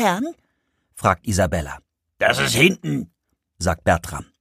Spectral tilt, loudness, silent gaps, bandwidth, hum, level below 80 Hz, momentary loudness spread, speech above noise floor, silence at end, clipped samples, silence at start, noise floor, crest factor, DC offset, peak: -4.5 dB/octave; -20 LUFS; none; 15.5 kHz; none; -42 dBFS; 16 LU; 50 dB; 0.15 s; under 0.1%; 0 s; -70 dBFS; 20 dB; under 0.1%; -2 dBFS